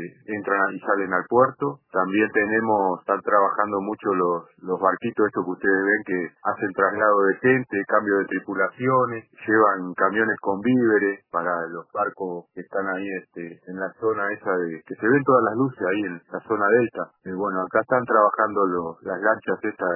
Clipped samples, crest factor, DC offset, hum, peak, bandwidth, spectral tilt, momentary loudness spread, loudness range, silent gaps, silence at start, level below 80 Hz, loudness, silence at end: under 0.1%; 20 dB; under 0.1%; none; -4 dBFS; 3.1 kHz; -11 dB/octave; 11 LU; 4 LU; none; 0 s; -70 dBFS; -23 LUFS; 0 s